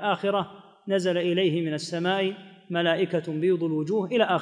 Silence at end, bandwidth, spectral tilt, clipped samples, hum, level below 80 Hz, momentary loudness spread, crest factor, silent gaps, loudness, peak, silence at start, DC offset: 0 s; 10.5 kHz; -6 dB/octave; under 0.1%; none; -78 dBFS; 6 LU; 16 dB; none; -26 LUFS; -8 dBFS; 0 s; under 0.1%